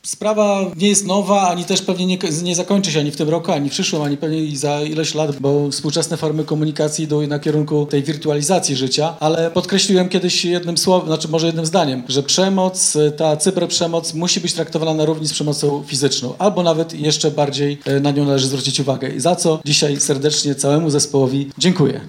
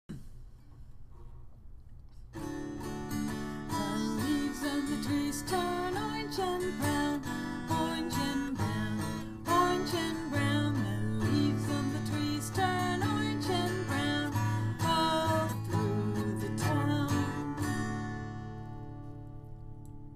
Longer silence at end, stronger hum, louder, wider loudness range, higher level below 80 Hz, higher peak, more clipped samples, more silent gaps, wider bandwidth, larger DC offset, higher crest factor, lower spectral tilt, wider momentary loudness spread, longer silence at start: about the same, 0 s vs 0 s; neither; first, -17 LUFS vs -32 LUFS; second, 3 LU vs 6 LU; second, -62 dBFS vs -50 dBFS; first, 0 dBFS vs -16 dBFS; neither; neither; about the same, 16.5 kHz vs 15.5 kHz; neither; about the same, 16 dB vs 18 dB; second, -4 dB/octave vs -5.5 dB/octave; second, 5 LU vs 13 LU; about the same, 0.05 s vs 0.1 s